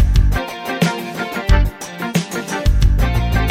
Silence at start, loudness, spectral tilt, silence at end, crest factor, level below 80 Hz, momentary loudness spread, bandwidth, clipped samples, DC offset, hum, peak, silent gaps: 0 s; -19 LUFS; -5.5 dB/octave; 0 s; 14 dB; -18 dBFS; 8 LU; 16 kHz; under 0.1%; under 0.1%; none; -2 dBFS; none